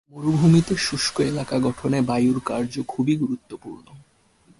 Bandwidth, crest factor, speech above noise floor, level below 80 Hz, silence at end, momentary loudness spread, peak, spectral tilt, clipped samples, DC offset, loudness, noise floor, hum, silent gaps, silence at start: 11.5 kHz; 16 dB; 36 dB; -52 dBFS; 0.6 s; 13 LU; -6 dBFS; -6 dB/octave; under 0.1%; under 0.1%; -22 LUFS; -58 dBFS; none; none; 0.15 s